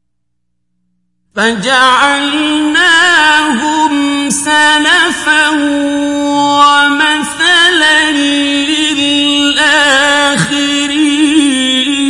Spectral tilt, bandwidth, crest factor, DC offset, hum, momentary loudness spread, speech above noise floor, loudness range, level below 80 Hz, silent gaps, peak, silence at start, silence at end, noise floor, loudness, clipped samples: -2 dB/octave; 11.5 kHz; 10 dB; under 0.1%; 60 Hz at -50 dBFS; 6 LU; 61 dB; 1 LU; -48 dBFS; none; 0 dBFS; 1.35 s; 0 s; -70 dBFS; -8 LUFS; 0.2%